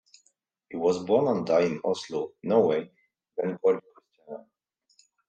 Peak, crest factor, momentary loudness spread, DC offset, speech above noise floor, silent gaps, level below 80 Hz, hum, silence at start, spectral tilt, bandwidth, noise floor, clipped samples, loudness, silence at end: -8 dBFS; 20 dB; 20 LU; under 0.1%; 47 dB; none; -74 dBFS; none; 0.7 s; -6.5 dB/octave; 8.8 kHz; -72 dBFS; under 0.1%; -26 LUFS; 0.9 s